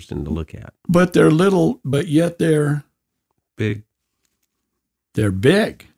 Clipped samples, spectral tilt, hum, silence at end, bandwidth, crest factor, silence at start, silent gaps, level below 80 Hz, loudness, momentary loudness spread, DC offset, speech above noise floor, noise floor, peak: under 0.1%; -7 dB/octave; none; 0.25 s; 15.5 kHz; 18 dB; 0 s; none; -44 dBFS; -18 LUFS; 14 LU; under 0.1%; 60 dB; -78 dBFS; -2 dBFS